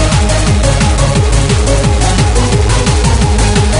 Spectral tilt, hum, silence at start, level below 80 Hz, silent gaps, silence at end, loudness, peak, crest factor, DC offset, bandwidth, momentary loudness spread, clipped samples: -5 dB/octave; none; 0 s; -12 dBFS; none; 0 s; -10 LUFS; 0 dBFS; 8 dB; under 0.1%; 11 kHz; 1 LU; under 0.1%